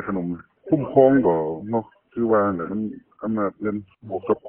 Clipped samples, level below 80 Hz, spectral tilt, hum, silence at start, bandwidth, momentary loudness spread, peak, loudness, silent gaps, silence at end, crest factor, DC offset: under 0.1%; -58 dBFS; -13 dB/octave; none; 0 s; 3.4 kHz; 17 LU; -2 dBFS; -22 LUFS; none; 0 s; 20 dB; under 0.1%